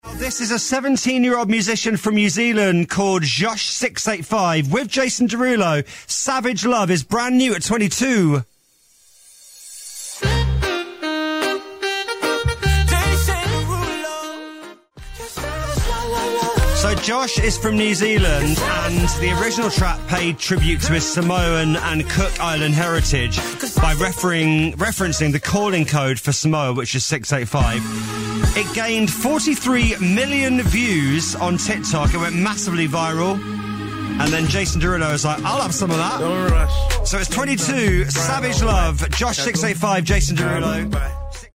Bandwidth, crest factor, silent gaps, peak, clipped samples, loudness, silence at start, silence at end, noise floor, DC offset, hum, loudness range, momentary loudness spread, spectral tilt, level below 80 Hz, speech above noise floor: 16 kHz; 14 dB; none; -6 dBFS; under 0.1%; -19 LUFS; 0.05 s; 0.05 s; -57 dBFS; under 0.1%; none; 4 LU; 7 LU; -4.5 dB/octave; -26 dBFS; 39 dB